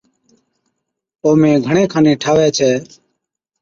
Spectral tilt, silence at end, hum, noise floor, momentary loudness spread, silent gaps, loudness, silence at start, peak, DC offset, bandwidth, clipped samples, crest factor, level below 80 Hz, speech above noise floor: -5.5 dB/octave; 0.75 s; none; -74 dBFS; 5 LU; none; -14 LUFS; 1.25 s; -2 dBFS; under 0.1%; 7.6 kHz; under 0.1%; 14 dB; -52 dBFS; 62 dB